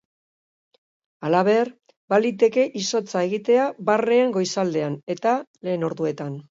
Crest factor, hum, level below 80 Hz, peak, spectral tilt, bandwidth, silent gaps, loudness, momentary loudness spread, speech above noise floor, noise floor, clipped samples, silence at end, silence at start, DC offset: 16 dB; none; -74 dBFS; -6 dBFS; -5 dB/octave; 7.8 kHz; 1.96-2.08 s, 5.03-5.07 s, 5.47-5.54 s; -22 LUFS; 8 LU; over 69 dB; under -90 dBFS; under 0.1%; 0.1 s; 1.2 s; under 0.1%